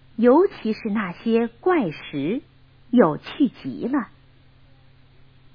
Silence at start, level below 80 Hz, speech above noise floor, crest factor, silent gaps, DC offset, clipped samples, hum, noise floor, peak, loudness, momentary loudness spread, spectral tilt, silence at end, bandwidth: 0.2 s; -58 dBFS; 31 dB; 20 dB; none; under 0.1%; under 0.1%; none; -52 dBFS; -2 dBFS; -22 LUFS; 11 LU; -9 dB/octave; 1.5 s; 5.2 kHz